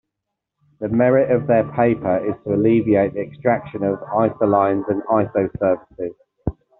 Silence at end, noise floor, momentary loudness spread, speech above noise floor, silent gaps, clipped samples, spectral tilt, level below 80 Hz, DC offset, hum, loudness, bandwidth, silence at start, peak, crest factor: 0.25 s; -81 dBFS; 14 LU; 62 dB; none; under 0.1%; -8.5 dB/octave; -46 dBFS; under 0.1%; none; -19 LUFS; 4 kHz; 0.8 s; -2 dBFS; 16 dB